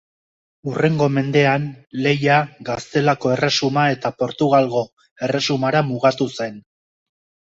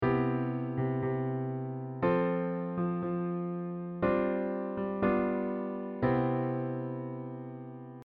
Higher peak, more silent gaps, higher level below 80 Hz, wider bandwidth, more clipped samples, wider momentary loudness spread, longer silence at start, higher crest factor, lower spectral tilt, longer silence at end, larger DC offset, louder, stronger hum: first, -2 dBFS vs -16 dBFS; first, 4.93-4.97 s, 5.11-5.16 s vs none; about the same, -58 dBFS vs -58 dBFS; first, 7.8 kHz vs 4.7 kHz; neither; about the same, 11 LU vs 9 LU; first, 0.65 s vs 0 s; about the same, 18 dB vs 16 dB; second, -5.5 dB/octave vs -8.5 dB/octave; first, 0.95 s vs 0 s; neither; first, -19 LUFS vs -33 LUFS; neither